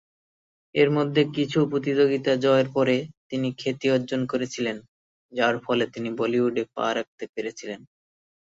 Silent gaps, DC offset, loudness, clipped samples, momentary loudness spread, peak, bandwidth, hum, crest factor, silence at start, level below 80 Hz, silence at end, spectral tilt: 3.17-3.30 s, 4.88-5.29 s, 7.07-7.18 s, 7.29-7.33 s; under 0.1%; -24 LUFS; under 0.1%; 12 LU; -6 dBFS; 7.8 kHz; none; 18 dB; 0.75 s; -68 dBFS; 0.65 s; -6 dB/octave